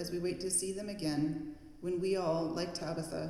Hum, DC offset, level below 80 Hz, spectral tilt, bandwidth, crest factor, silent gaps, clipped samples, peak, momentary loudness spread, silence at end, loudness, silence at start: none; under 0.1%; -60 dBFS; -4.5 dB/octave; 14.5 kHz; 14 dB; none; under 0.1%; -22 dBFS; 7 LU; 0 s; -36 LUFS; 0 s